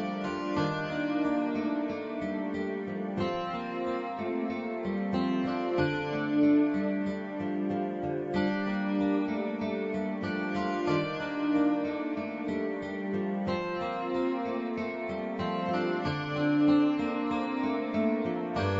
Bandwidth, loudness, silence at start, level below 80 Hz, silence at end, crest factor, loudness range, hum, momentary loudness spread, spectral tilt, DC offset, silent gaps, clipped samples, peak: 7.6 kHz; -31 LUFS; 0 s; -62 dBFS; 0 s; 16 dB; 3 LU; none; 7 LU; -7.5 dB/octave; under 0.1%; none; under 0.1%; -14 dBFS